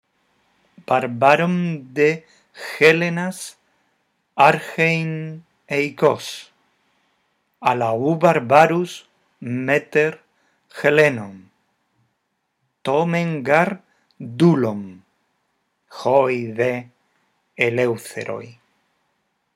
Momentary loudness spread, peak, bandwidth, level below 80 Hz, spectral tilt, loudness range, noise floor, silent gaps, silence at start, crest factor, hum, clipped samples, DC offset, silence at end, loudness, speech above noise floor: 18 LU; 0 dBFS; 15 kHz; -72 dBFS; -6 dB/octave; 4 LU; -73 dBFS; none; 0.9 s; 20 dB; none; under 0.1%; under 0.1%; 1.05 s; -19 LUFS; 54 dB